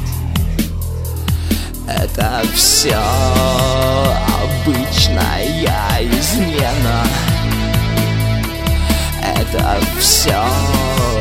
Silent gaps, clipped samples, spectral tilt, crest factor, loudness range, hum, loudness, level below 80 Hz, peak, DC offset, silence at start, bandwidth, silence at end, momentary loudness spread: none; under 0.1%; -4 dB/octave; 14 dB; 3 LU; none; -15 LUFS; -22 dBFS; 0 dBFS; under 0.1%; 0 s; 16.5 kHz; 0 s; 8 LU